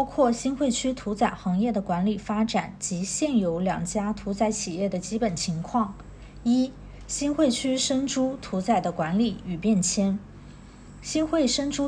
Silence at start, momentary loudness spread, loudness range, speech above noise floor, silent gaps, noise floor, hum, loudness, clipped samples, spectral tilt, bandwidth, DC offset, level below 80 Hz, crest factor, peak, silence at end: 0 s; 7 LU; 2 LU; 20 dB; none; -45 dBFS; none; -26 LUFS; under 0.1%; -4.5 dB/octave; 10.5 kHz; under 0.1%; -48 dBFS; 16 dB; -10 dBFS; 0 s